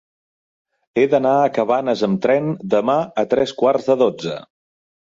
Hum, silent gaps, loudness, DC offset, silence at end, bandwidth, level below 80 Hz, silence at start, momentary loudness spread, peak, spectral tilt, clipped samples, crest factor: none; none; -18 LUFS; under 0.1%; 0.65 s; 7.6 kHz; -60 dBFS; 0.95 s; 5 LU; -4 dBFS; -6.5 dB/octave; under 0.1%; 16 dB